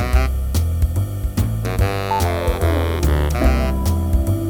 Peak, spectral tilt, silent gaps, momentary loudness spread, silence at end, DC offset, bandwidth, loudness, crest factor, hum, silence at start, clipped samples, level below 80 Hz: -4 dBFS; -6.5 dB/octave; none; 4 LU; 0 s; under 0.1%; over 20 kHz; -20 LUFS; 14 dB; none; 0 s; under 0.1%; -20 dBFS